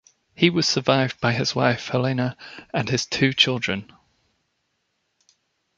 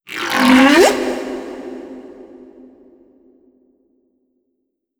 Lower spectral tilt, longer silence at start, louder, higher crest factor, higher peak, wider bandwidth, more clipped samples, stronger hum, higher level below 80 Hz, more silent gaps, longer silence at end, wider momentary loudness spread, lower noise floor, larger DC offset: first, -4.5 dB/octave vs -3 dB/octave; first, 0.4 s vs 0.1 s; second, -22 LUFS vs -13 LUFS; about the same, 22 dB vs 18 dB; about the same, -2 dBFS vs 0 dBFS; second, 7.8 kHz vs 20 kHz; neither; neither; second, -58 dBFS vs -52 dBFS; neither; second, 1.95 s vs 2.75 s; second, 10 LU vs 24 LU; about the same, -73 dBFS vs -72 dBFS; neither